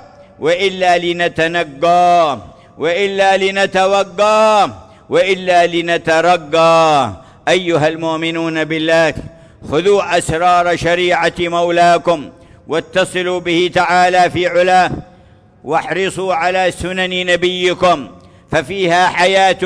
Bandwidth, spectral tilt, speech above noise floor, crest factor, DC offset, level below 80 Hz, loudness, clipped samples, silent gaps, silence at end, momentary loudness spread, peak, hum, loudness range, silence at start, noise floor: 11 kHz; -4.5 dB/octave; 32 dB; 12 dB; under 0.1%; -44 dBFS; -13 LUFS; under 0.1%; none; 0 s; 8 LU; -2 dBFS; none; 3 LU; 0.4 s; -45 dBFS